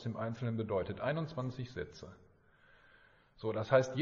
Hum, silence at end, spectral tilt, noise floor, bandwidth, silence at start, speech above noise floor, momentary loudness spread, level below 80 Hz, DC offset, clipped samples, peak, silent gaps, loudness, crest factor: none; 0 s; -6 dB/octave; -65 dBFS; 7.4 kHz; 0 s; 30 dB; 15 LU; -64 dBFS; under 0.1%; under 0.1%; -14 dBFS; none; -37 LUFS; 22 dB